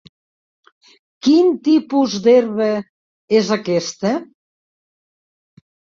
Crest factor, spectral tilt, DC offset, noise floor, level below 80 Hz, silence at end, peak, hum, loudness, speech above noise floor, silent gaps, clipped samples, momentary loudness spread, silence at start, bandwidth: 16 dB; -5.5 dB/octave; under 0.1%; under -90 dBFS; -64 dBFS; 1.75 s; -2 dBFS; none; -17 LUFS; over 75 dB; 2.89-3.28 s; under 0.1%; 8 LU; 1.25 s; 7.6 kHz